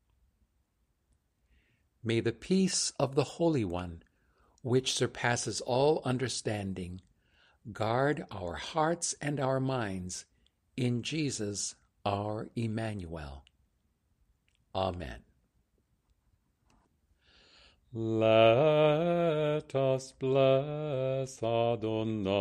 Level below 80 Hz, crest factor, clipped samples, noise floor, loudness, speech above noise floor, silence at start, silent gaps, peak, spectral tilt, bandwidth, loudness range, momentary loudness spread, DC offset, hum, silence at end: -60 dBFS; 22 dB; under 0.1%; -76 dBFS; -31 LUFS; 45 dB; 2.05 s; none; -10 dBFS; -5 dB/octave; 13 kHz; 15 LU; 15 LU; under 0.1%; none; 0 s